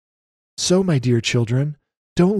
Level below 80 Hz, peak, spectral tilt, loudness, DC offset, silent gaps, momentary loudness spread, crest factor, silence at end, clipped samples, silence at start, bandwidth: -50 dBFS; -4 dBFS; -5.5 dB/octave; -20 LUFS; under 0.1%; 1.97-2.16 s; 10 LU; 16 dB; 0 s; under 0.1%; 0.6 s; 12.5 kHz